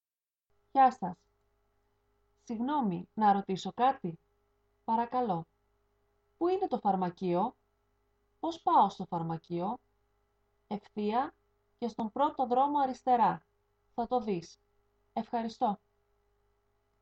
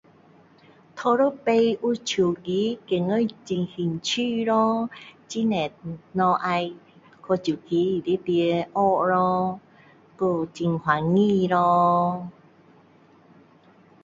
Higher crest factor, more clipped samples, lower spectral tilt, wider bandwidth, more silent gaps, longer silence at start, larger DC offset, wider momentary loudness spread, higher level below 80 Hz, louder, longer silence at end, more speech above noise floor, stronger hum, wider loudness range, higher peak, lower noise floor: about the same, 18 dB vs 18 dB; neither; about the same, -7 dB/octave vs -6 dB/octave; about the same, 7.8 kHz vs 7.8 kHz; neither; second, 0.75 s vs 0.95 s; neither; first, 14 LU vs 9 LU; second, -72 dBFS vs -64 dBFS; second, -32 LUFS vs -24 LUFS; second, 1.25 s vs 1.7 s; first, over 59 dB vs 32 dB; first, 50 Hz at -65 dBFS vs none; about the same, 4 LU vs 3 LU; second, -14 dBFS vs -6 dBFS; first, under -90 dBFS vs -55 dBFS